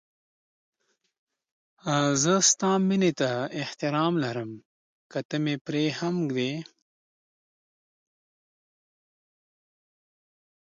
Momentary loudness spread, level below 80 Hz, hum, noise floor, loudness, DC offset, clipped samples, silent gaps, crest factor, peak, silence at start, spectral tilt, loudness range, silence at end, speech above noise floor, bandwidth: 15 LU; -74 dBFS; none; under -90 dBFS; -26 LUFS; under 0.1%; under 0.1%; 4.65-5.10 s, 5.25-5.29 s, 5.61-5.65 s; 22 dB; -8 dBFS; 1.85 s; -4 dB/octave; 9 LU; 4 s; over 64 dB; 10 kHz